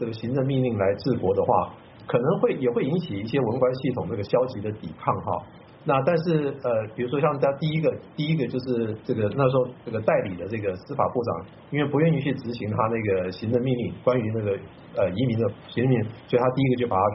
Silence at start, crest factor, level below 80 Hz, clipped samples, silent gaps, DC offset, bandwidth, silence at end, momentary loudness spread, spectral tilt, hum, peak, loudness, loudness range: 0 s; 18 dB; -58 dBFS; under 0.1%; none; under 0.1%; 5.8 kHz; 0 s; 8 LU; -6.5 dB/octave; none; -6 dBFS; -25 LUFS; 2 LU